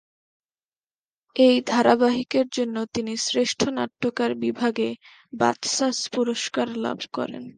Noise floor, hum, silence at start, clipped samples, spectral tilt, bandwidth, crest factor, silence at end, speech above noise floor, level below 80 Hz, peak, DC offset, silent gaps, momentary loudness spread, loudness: under -90 dBFS; none; 1.35 s; under 0.1%; -3 dB/octave; 10 kHz; 22 dB; 0.1 s; over 67 dB; -66 dBFS; -2 dBFS; under 0.1%; none; 10 LU; -23 LUFS